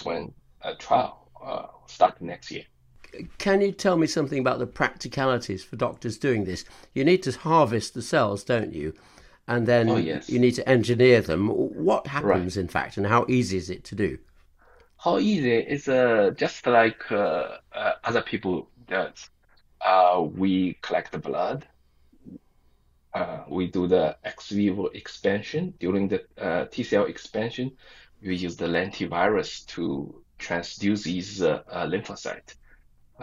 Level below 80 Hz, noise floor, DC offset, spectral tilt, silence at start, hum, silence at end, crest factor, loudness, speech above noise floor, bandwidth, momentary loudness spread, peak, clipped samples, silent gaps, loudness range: -56 dBFS; -61 dBFS; under 0.1%; -6 dB/octave; 0 s; none; 0 s; 20 dB; -25 LUFS; 37 dB; 13 kHz; 14 LU; -4 dBFS; under 0.1%; none; 6 LU